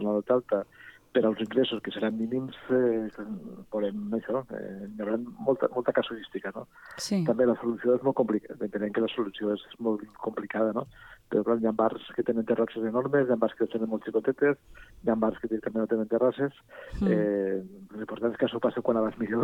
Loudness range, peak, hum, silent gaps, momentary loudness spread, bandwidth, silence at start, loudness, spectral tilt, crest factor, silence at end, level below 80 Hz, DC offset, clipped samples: 3 LU; -10 dBFS; none; none; 11 LU; 12.5 kHz; 0 s; -29 LUFS; -6.5 dB/octave; 18 dB; 0 s; -58 dBFS; under 0.1%; under 0.1%